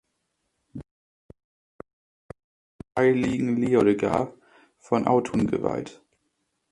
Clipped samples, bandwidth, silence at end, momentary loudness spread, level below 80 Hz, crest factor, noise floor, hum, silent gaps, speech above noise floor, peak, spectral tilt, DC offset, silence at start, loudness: under 0.1%; 11.5 kHz; 0.8 s; 23 LU; -56 dBFS; 20 dB; -77 dBFS; none; 0.91-1.29 s, 1.44-1.79 s, 1.93-2.29 s, 2.44-2.79 s; 54 dB; -6 dBFS; -7.5 dB/octave; under 0.1%; 0.75 s; -24 LUFS